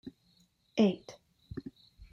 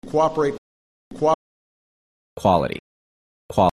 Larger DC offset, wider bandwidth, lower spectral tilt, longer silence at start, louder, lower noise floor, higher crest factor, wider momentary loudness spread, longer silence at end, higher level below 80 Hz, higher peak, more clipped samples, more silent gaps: neither; second, 7 kHz vs 13 kHz; about the same, -7 dB/octave vs -6.5 dB/octave; about the same, 0.05 s vs 0.05 s; second, -31 LUFS vs -22 LUFS; second, -69 dBFS vs under -90 dBFS; about the same, 22 dB vs 20 dB; first, 23 LU vs 10 LU; about the same, 0.1 s vs 0 s; second, -62 dBFS vs -50 dBFS; second, -14 dBFS vs -4 dBFS; neither; second, none vs 0.58-1.11 s, 1.34-2.36 s, 2.79-3.49 s